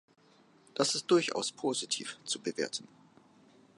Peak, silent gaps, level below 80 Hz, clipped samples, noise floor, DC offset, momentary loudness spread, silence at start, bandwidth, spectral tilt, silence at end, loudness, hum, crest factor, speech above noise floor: -14 dBFS; none; -84 dBFS; under 0.1%; -63 dBFS; under 0.1%; 9 LU; 0.75 s; 11.5 kHz; -2.5 dB/octave; 0.9 s; -32 LUFS; none; 22 dB; 30 dB